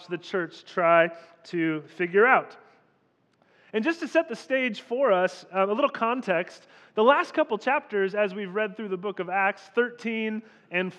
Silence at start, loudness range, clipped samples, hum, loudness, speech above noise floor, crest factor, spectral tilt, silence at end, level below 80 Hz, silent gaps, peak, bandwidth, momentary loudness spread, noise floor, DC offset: 0 s; 2 LU; under 0.1%; none; -26 LUFS; 42 dB; 20 dB; -5.5 dB/octave; 0.05 s; under -90 dBFS; none; -6 dBFS; 10 kHz; 11 LU; -67 dBFS; under 0.1%